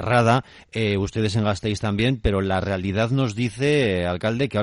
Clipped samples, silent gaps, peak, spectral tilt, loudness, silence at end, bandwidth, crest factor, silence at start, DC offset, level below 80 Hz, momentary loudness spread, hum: under 0.1%; none; -6 dBFS; -6.5 dB/octave; -22 LUFS; 0 s; 11 kHz; 16 dB; 0 s; under 0.1%; -40 dBFS; 5 LU; none